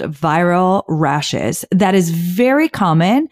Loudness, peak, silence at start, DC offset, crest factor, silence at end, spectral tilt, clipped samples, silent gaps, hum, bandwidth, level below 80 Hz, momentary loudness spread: -15 LUFS; -4 dBFS; 0 s; under 0.1%; 10 dB; 0.05 s; -6 dB/octave; under 0.1%; none; none; 16 kHz; -52 dBFS; 4 LU